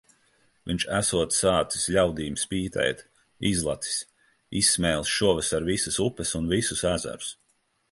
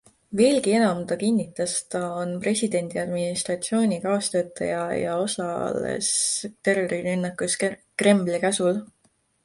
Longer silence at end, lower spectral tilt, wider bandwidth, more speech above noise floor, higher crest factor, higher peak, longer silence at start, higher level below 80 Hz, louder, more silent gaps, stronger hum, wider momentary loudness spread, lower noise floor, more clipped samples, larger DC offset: about the same, 0.6 s vs 0.6 s; about the same, -3 dB/octave vs -4 dB/octave; about the same, 12 kHz vs 11.5 kHz; about the same, 44 dB vs 42 dB; about the same, 20 dB vs 20 dB; about the same, -8 dBFS vs -6 dBFS; first, 0.65 s vs 0.3 s; first, -46 dBFS vs -64 dBFS; about the same, -25 LUFS vs -24 LUFS; neither; neither; first, 11 LU vs 7 LU; first, -70 dBFS vs -66 dBFS; neither; neither